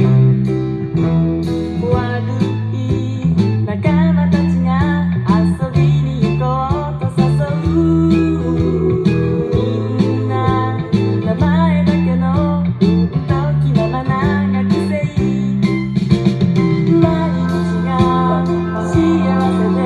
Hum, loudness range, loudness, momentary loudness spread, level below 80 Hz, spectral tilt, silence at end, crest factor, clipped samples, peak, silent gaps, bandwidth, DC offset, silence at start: none; 1 LU; -15 LUFS; 5 LU; -36 dBFS; -9 dB/octave; 0 s; 14 dB; under 0.1%; 0 dBFS; none; 9.2 kHz; under 0.1%; 0 s